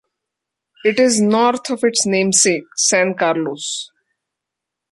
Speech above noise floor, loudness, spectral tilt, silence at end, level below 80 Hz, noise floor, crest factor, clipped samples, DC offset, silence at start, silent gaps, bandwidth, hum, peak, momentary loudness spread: 66 dB; -16 LUFS; -2.5 dB/octave; 1.05 s; -64 dBFS; -82 dBFS; 18 dB; under 0.1%; under 0.1%; 0.85 s; none; 11.5 kHz; none; 0 dBFS; 10 LU